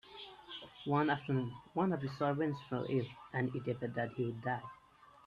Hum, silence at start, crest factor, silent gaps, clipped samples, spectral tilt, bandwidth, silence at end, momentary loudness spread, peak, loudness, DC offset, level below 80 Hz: none; 0.05 s; 18 dB; none; under 0.1%; -8.5 dB/octave; 7.2 kHz; 0.5 s; 14 LU; -20 dBFS; -37 LUFS; under 0.1%; -72 dBFS